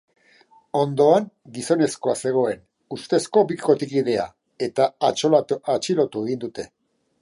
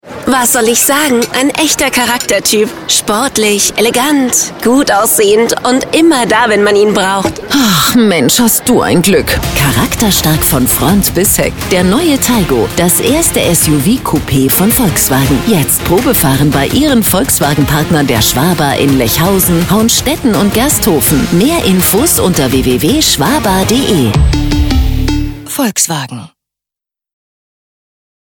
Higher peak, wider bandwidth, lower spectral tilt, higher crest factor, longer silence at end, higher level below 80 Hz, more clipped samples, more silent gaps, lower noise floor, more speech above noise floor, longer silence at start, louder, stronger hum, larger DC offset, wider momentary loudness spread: second, -4 dBFS vs 0 dBFS; second, 11.5 kHz vs 19.5 kHz; first, -5.5 dB/octave vs -4 dB/octave; first, 18 dB vs 10 dB; second, 0.55 s vs 2 s; second, -66 dBFS vs -24 dBFS; neither; neither; second, -56 dBFS vs -85 dBFS; second, 35 dB vs 76 dB; first, 0.75 s vs 0.05 s; second, -21 LUFS vs -9 LUFS; neither; neither; first, 15 LU vs 4 LU